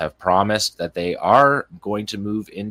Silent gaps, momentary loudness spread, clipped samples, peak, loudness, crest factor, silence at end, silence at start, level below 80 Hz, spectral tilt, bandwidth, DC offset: none; 12 LU; under 0.1%; 0 dBFS; -20 LUFS; 18 dB; 0 s; 0 s; -54 dBFS; -4.5 dB/octave; 16 kHz; under 0.1%